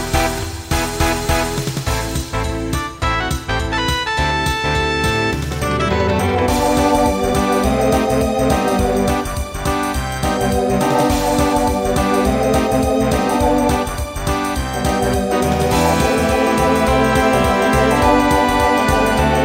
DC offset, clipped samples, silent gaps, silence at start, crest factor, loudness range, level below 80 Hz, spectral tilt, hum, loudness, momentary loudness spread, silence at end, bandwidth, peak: under 0.1%; under 0.1%; none; 0 s; 16 dB; 5 LU; -26 dBFS; -5 dB/octave; none; -16 LUFS; 6 LU; 0 s; 16.5 kHz; -2 dBFS